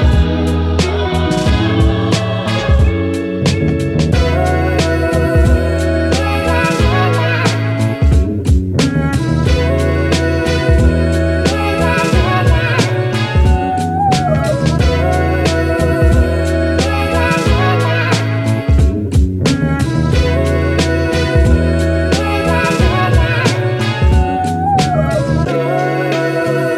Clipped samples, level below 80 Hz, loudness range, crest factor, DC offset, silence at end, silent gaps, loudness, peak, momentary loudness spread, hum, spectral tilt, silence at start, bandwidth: under 0.1%; -18 dBFS; 1 LU; 12 dB; under 0.1%; 0 s; none; -14 LUFS; 0 dBFS; 3 LU; none; -6.5 dB/octave; 0 s; 13 kHz